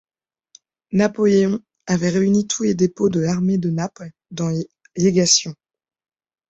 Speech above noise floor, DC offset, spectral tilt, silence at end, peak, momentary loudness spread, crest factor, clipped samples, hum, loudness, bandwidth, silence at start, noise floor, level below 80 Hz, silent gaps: 48 dB; under 0.1%; -5 dB/octave; 0.95 s; -2 dBFS; 12 LU; 18 dB; under 0.1%; none; -19 LUFS; 8.2 kHz; 0.9 s; -66 dBFS; -56 dBFS; none